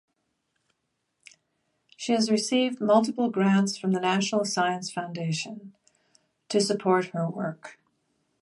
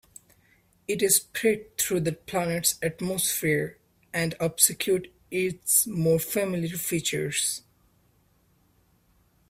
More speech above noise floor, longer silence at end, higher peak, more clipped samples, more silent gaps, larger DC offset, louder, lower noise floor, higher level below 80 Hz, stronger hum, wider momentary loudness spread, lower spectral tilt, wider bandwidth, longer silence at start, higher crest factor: first, 53 dB vs 39 dB; second, 0.7 s vs 1.9 s; about the same, -6 dBFS vs -4 dBFS; neither; neither; neither; about the same, -26 LUFS vs -25 LUFS; first, -78 dBFS vs -65 dBFS; second, -78 dBFS vs -62 dBFS; neither; first, 11 LU vs 8 LU; first, -5 dB/octave vs -3 dB/octave; second, 11.5 kHz vs 16 kHz; first, 2 s vs 0.9 s; about the same, 20 dB vs 24 dB